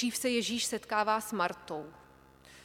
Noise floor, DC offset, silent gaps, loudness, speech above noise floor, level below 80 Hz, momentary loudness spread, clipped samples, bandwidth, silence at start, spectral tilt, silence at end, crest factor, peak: -58 dBFS; under 0.1%; none; -32 LUFS; 25 dB; -68 dBFS; 12 LU; under 0.1%; 17.5 kHz; 0 s; -2.5 dB/octave; 0 s; 18 dB; -16 dBFS